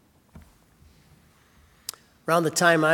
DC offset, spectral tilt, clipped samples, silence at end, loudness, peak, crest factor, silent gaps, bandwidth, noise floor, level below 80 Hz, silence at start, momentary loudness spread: under 0.1%; -4 dB/octave; under 0.1%; 0 s; -22 LUFS; -4 dBFS; 22 dB; none; 18 kHz; -58 dBFS; -62 dBFS; 0.35 s; 19 LU